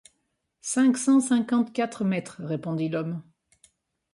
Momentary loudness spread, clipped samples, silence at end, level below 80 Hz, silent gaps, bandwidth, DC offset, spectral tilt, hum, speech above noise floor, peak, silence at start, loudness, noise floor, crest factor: 12 LU; under 0.1%; 0.95 s; -72 dBFS; none; 11.5 kHz; under 0.1%; -5.5 dB/octave; none; 52 dB; -12 dBFS; 0.65 s; -25 LUFS; -76 dBFS; 14 dB